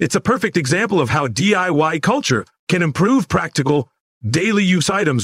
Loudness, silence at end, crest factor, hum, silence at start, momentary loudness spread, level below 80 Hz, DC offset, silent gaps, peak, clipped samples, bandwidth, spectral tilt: -17 LUFS; 0 s; 14 dB; none; 0 s; 6 LU; -50 dBFS; under 0.1%; 2.59-2.67 s, 4.00-4.21 s; -4 dBFS; under 0.1%; 15.5 kHz; -5 dB/octave